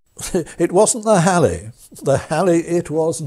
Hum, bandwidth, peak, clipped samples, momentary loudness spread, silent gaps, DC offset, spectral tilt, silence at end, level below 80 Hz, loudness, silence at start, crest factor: none; 15.5 kHz; -2 dBFS; under 0.1%; 10 LU; none; under 0.1%; -5 dB/octave; 0 s; -44 dBFS; -17 LUFS; 0.2 s; 16 dB